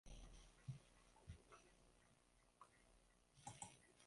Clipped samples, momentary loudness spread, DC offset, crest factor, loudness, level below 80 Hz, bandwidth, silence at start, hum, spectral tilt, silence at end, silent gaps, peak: under 0.1%; 11 LU; under 0.1%; 26 dB; -62 LUFS; -70 dBFS; 11.5 kHz; 0.05 s; none; -4 dB/octave; 0 s; none; -36 dBFS